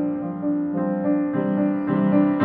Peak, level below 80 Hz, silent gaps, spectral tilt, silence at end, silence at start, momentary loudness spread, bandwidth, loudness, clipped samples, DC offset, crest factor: -8 dBFS; -62 dBFS; none; -12 dB/octave; 0 s; 0 s; 6 LU; 3.7 kHz; -22 LUFS; under 0.1%; under 0.1%; 14 dB